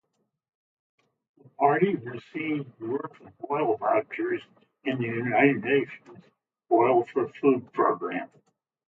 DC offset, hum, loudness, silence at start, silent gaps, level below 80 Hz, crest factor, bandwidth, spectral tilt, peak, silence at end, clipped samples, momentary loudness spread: under 0.1%; none; -26 LUFS; 1.6 s; none; -76 dBFS; 20 dB; 4.4 kHz; -9 dB/octave; -6 dBFS; 0.6 s; under 0.1%; 14 LU